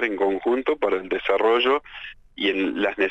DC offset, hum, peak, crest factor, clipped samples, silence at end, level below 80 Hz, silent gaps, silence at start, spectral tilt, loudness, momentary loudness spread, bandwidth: under 0.1%; none; -8 dBFS; 16 dB; under 0.1%; 0 s; -54 dBFS; none; 0 s; -5.5 dB/octave; -22 LUFS; 10 LU; 8 kHz